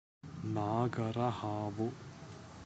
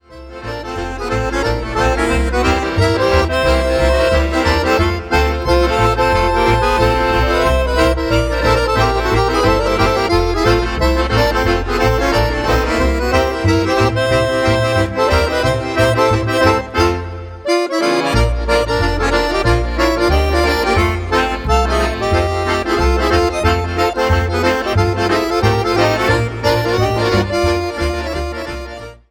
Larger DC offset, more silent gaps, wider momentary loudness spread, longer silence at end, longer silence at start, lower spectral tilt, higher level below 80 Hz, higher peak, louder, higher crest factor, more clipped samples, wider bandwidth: neither; neither; first, 16 LU vs 4 LU; second, 0 s vs 0.15 s; first, 0.25 s vs 0.1 s; first, -7.5 dB/octave vs -5.5 dB/octave; second, -66 dBFS vs -22 dBFS; second, -18 dBFS vs 0 dBFS; second, -37 LUFS vs -15 LUFS; about the same, 18 dB vs 14 dB; neither; second, 8.2 kHz vs 18.5 kHz